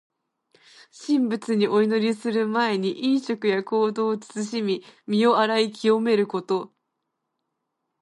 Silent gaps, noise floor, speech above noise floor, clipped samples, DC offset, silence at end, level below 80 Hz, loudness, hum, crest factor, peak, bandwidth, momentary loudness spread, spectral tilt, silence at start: none; -79 dBFS; 56 dB; under 0.1%; under 0.1%; 1.35 s; -76 dBFS; -23 LUFS; none; 16 dB; -8 dBFS; 11.5 kHz; 8 LU; -5.5 dB/octave; 0.95 s